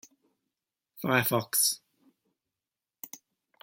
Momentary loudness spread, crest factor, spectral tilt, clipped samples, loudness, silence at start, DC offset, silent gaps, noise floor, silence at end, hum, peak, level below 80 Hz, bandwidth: 21 LU; 24 dB; -2.5 dB/octave; under 0.1%; -27 LUFS; 0.95 s; under 0.1%; none; under -90 dBFS; 0.45 s; none; -10 dBFS; -76 dBFS; 17 kHz